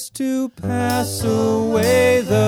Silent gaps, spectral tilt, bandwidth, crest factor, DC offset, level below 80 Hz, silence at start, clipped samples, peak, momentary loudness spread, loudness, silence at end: none; -5.5 dB/octave; 19 kHz; 12 dB; under 0.1%; -48 dBFS; 0 s; under 0.1%; -4 dBFS; 8 LU; -18 LUFS; 0 s